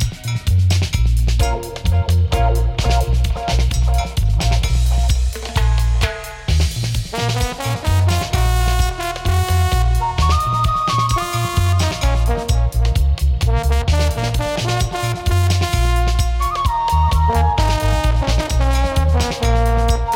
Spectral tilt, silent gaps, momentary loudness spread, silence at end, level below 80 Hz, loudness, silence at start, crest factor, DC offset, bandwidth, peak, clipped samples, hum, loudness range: -5 dB/octave; none; 4 LU; 0 s; -18 dBFS; -18 LUFS; 0 s; 14 dB; under 0.1%; 16.5 kHz; -2 dBFS; under 0.1%; none; 2 LU